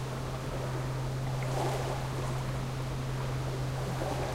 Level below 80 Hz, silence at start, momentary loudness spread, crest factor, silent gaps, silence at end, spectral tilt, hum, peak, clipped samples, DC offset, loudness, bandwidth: -44 dBFS; 0 s; 3 LU; 14 dB; none; 0 s; -6 dB/octave; none; -20 dBFS; under 0.1%; 0.1%; -34 LUFS; 16 kHz